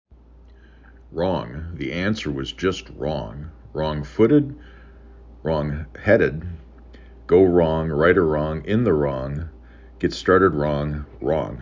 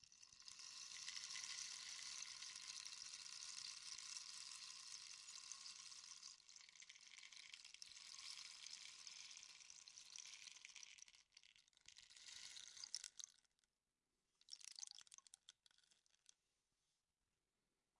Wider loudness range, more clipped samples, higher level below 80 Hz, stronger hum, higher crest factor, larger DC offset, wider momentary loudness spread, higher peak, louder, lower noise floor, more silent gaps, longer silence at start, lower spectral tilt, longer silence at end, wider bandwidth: second, 7 LU vs 11 LU; neither; first, -38 dBFS vs under -90 dBFS; neither; second, 20 dB vs 28 dB; neither; first, 16 LU vs 12 LU; first, -2 dBFS vs -30 dBFS; first, -21 LUFS vs -55 LUFS; second, -48 dBFS vs under -90 dBFS; neither; first, 1.1 s vs 0 s; first, -7.5 dB/octave vs 3.5 dB/octave; second, 0 s vs 2 s; second, 7.6 kHz vs 12 kHz